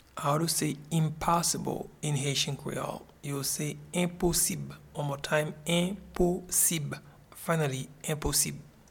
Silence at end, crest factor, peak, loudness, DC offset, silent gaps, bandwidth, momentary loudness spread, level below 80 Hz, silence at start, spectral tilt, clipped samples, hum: 0.2 s; 20 dB; -10 dBFS; -30 LUFS; under 0.1%; none; 19 kHz; 11 LU; -50 dBFS; 0.15 s; -3.5 dB/octave; under 0.1%; none